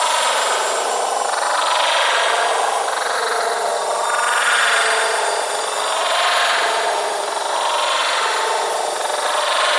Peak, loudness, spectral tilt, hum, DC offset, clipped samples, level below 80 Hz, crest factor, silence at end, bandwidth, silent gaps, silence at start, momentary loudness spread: -4 dBFS; -17 LUFS; 2 dB/octave; none; under 0.1%; under 0.1%; -82 dBFS; 14 dB; 0 s; 12 kHz; none; 0 s; 5 LU